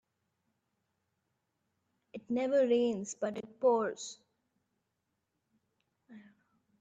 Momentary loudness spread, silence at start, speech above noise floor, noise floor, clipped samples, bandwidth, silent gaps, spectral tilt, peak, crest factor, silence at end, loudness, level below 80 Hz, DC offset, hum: 17 LU; 2.15 s; 53 dB; -84 dBFS; under 0.1%; 9 kHz; none; -4.5 dB/octave; -18 dBFS; 20 dB; 0.6 s; -32 LUFS; -84 dBFS; under 0.1%; none